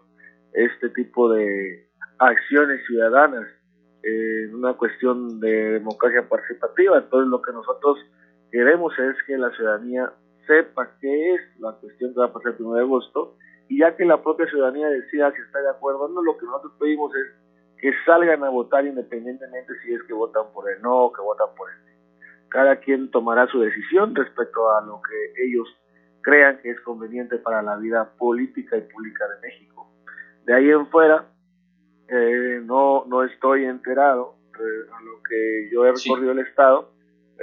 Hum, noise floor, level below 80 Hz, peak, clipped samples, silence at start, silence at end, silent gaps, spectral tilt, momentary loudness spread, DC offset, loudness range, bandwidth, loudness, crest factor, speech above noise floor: 60 Hz at -55 dBFS; -63 dBFS; -80 dBFS; 0 dBFS; under 0.1%; 0.55 s; 0 s; none; -6 dB/octave; 15 LU; under 0.1%; 4 LU; 6.8 kHz; -20 LUFS; 20 dB; 42 dB